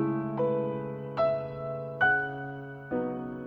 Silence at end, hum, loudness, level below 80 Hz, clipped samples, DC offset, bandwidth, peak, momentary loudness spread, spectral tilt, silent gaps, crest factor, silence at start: 0 s; none; -30 LUFS; -62 dBFS; under 0.1%; under 0.1%; 5.8 kHz; -14 dBFS; 11 LU; -9 dB/octave; none; 18 dB; 0 s